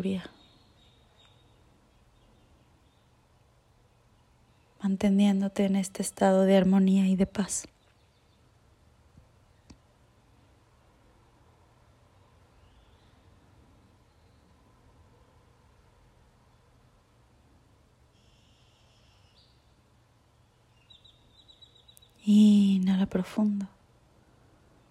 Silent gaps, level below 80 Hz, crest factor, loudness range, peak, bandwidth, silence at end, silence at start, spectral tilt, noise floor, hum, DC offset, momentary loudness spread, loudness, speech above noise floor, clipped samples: none; -62 dBFS; 20 dB; 12 LU; -10 dBFS; 13 kHz; 1.25 s; 0 s; -6.5 dB/octave; -63 dBFS; none; under 0.1%; 15 LU; -25 LUFS; 39 dB; under 0.1%